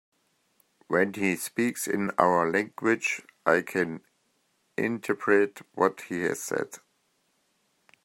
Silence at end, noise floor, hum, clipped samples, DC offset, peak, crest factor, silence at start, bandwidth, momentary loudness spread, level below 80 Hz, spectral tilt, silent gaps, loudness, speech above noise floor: 1.3 s; -72 dBFS; none; under 0.1%; under 0.1%; -4 dBFS; 24 dB; 0.9 s; 16.5 kHz; 9 LU; -74 dBFS; -5 dB/octave; none; -27 LUFS; 45 dB